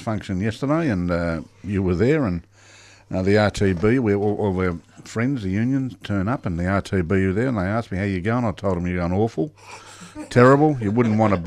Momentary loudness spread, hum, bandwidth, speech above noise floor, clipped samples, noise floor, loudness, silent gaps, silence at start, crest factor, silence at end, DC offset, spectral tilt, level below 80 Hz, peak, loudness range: 11 LU; none; 11 kHz; 28 dB; under 0.1%; -48 dBFS; -21 LUFS; none; 0 s; 18 dB; 0 s; under 0.1%; -7.5 dB/octave; -44 dBFS; -2 dBFS; 3 LU